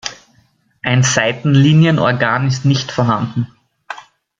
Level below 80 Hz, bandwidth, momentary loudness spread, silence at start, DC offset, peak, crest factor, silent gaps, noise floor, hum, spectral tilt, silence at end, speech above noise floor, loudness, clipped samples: -52 dBFS; 7.8 kHz; 20 LU; 0.05 s; under 0.1%; 0 dBFS; 16 dB; none; -56 dBFS; none; -5.5 dB/octave; 0.4 s; 43 dB; -14 LUFS; under 0.1%